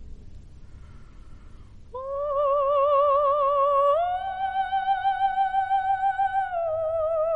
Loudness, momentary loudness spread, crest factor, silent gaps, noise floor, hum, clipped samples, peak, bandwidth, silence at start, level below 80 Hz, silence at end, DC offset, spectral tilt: -24 LUFS; 8 LU; 12 dB; none; -45 dBFS; none; under 0.1%; -12 dBFS; 4.7 kHz; 0 s; -48 dBFS; 0 s; 0.2%; -5 dB/octave